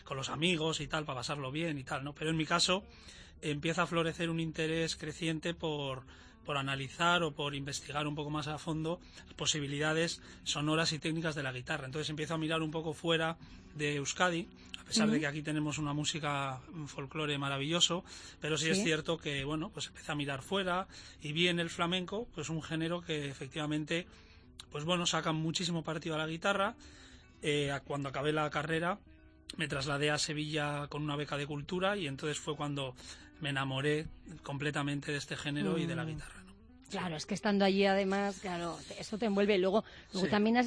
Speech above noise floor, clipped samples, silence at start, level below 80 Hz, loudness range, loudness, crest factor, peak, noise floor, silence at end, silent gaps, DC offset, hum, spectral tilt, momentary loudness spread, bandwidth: 21 dB; under 0.1%; 0 s; -60 dBFS; 3 LU; -35 LUFS; 20 dB; -14 dBFS; -56 dBFS; 0 s; none; under 0.1%; none; -4 dB/octave; 12 LU; 11 kHz